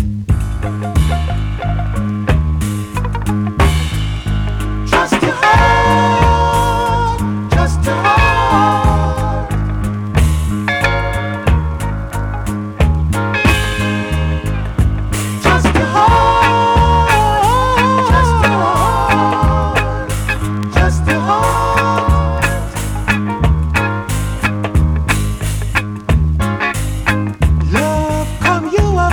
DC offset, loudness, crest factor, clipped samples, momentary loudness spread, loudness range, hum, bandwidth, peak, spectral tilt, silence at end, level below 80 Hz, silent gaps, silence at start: under 0.1%; -14 LUFS; 12 dB; under 0.1%; 8 LU; 5 LU; none; 19.5 kHz; -2 dBFS; -5.5 dB/octave; 0 s; -20 dBFS; none; 0 s